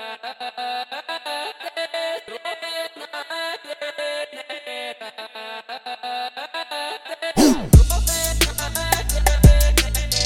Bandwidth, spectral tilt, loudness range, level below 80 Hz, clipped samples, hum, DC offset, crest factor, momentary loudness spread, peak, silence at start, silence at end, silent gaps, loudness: 17.5 kHz; -4 dB/octave; 12 LU; -24 dBFS; under 0.1%; none; under 0.1%; 20 dB; 18 LU; -2 dBFS; 0 s; 0 s; none; -21 LUFS